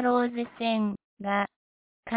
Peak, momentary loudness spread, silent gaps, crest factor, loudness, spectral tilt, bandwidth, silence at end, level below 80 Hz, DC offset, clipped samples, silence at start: -12 dBFS; 9 LU; 1.04-1.17 s, 1.56-2.03 s; 16 dB; -29 LUFS; -4 dB/octave; 4 kHz; 0 s; -68 dBFS; under 0.1%; under 0.1%; 0 s